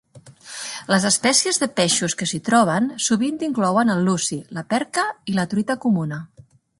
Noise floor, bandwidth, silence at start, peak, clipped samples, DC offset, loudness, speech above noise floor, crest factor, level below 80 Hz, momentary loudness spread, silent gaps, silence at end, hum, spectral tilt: -43 dBFS; 11.5 kHz; 0.15 s; -2 dBFS; under 0.1%; under 0.1%; -20 LUFS; 23 dB; 18 dB; -62 dBFS; 13 LU; none; 0.55 s; none; -3.5 dB/octave